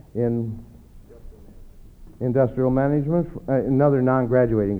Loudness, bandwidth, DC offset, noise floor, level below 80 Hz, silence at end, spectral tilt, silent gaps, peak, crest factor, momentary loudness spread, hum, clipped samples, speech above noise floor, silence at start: -21 LUFS; 3.8 kHz; under 0.1%; -45 dBFS; -44 dBFS; 0 s; -11.5 dB/octave; none; -6 dBFS; 18 dB; 9 LU; none; under 0.1%; 25 dB; 0.15 s